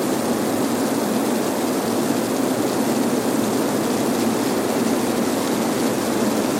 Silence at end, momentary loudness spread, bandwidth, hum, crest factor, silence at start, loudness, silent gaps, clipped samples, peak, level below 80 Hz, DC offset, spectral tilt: 0 s; 1 LU; 16.5 kHz; none; 12 dB; 0 s; -21 LUFS; none; under 0.1%; -8 dBFS; -56 dBFS; under 0.1%; -4.5 dB/octave